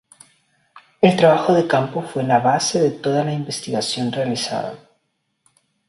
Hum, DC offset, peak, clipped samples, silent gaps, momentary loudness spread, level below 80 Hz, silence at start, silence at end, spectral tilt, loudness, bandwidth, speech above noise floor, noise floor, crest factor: none; under 0.1%; 0 dBFS; under 0.1%; none; 10 LU; -62 dBFS; 0.75 s; 1.15 s; -5 dB/octave; -19 LUFS; 11.5 kHz; 53 dB; -71 dBFS; 20 dB